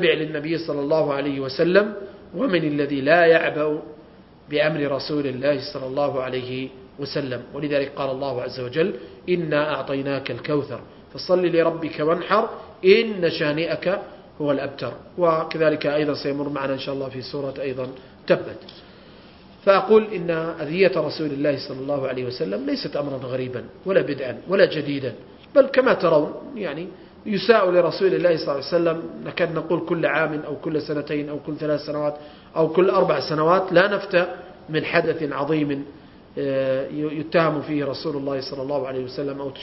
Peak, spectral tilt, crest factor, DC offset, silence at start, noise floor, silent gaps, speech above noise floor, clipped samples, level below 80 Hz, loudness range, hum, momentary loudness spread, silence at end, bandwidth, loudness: -2 dBFS; -9.5 dB/octave; 22 dB; under 0.1%; 0 s; -47 dBFS; none; 25 dB; under 0.1%; -58 dBFS; 5 LU; none; 12 LU; 0 s; 5.8 kHz; -22 LUFS